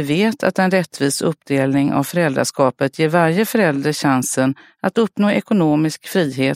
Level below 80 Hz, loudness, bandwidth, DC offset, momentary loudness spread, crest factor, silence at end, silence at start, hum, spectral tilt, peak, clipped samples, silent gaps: -60 dBFS; -17 LUFS; 16 kHz; under 0.1%; 4 LU; 16 dB; 0 s; 0 s; none; -5.5 dB/octave; 0 dBFS; under 0.1%; none